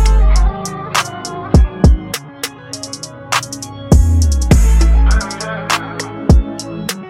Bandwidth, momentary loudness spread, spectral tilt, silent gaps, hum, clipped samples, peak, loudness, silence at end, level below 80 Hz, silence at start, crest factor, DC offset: 16 kHz; 13 LU; -5 dB/octave; none; none; under 0.1%; 0 dBFS; -15 LUFS; 0 s; -14 dBFS; 0 s; 12 dB; under 0.1%